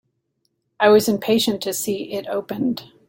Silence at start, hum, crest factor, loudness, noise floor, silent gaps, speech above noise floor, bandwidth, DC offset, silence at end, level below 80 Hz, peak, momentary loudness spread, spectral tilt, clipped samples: 0.8 s; none; 18 dB; -20 LUFS; -72 dBFS; none; 52 dB; 17 kHz; under 0.1%; 0.25 s; -62 dBFS; -2 dBFS; 11 LU; -4 dB/octave; under 0.1%